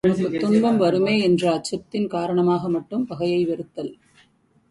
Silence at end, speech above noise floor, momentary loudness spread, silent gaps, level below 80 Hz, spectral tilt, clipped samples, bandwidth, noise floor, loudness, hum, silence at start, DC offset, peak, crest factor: 0.75 s; 39 dB; 10 LU; none; -58 dBFS; -6.5 dB/octave; under 0.1%; 11.5 kHz; -60 dBFS; -21 LUFS; none; 0.05 s; under 0.1%; -6 dBFS; 16 dB